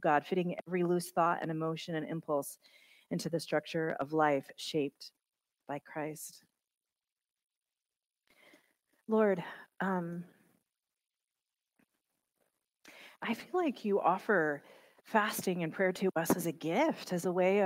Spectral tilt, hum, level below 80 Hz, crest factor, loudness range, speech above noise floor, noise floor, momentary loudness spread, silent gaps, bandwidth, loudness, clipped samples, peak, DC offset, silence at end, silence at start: -5.5 dB/octave; none; -80 dBFS; 20 dB; 15 LU; over 57 dB; under -90 dBFS; 14 LU; none; 16 kHz; -34 LUFS; under 0.1%; -14 dBFS; under 0.1%; 0 s; 0 s